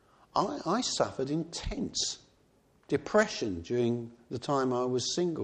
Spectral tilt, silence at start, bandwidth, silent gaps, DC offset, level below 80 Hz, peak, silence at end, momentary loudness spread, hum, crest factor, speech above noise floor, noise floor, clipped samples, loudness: -4 dB/octave; 0.35 s; 10.5 kHz; none; under 0.1%; -52 dBFS; -12 dBFS; 0 s; 8 LU; none; 20 dB; 35 dB; -66 dBFS; under 0.1%; -31 LUFS